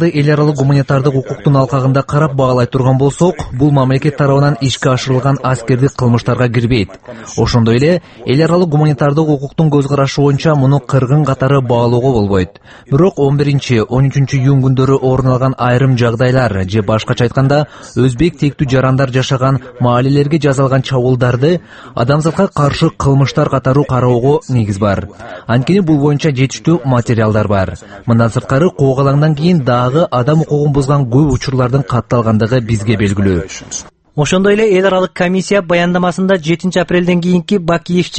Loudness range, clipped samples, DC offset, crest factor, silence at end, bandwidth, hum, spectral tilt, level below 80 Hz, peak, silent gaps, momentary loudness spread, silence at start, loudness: 1 LU; under 0.1%; under 0.1%; 12 dB; 0 s; 8.8 kHz; none; -7 dB/octave; -36 dBFS; 0 dBFS; none; 4 LU; 0 s; -12 LUFS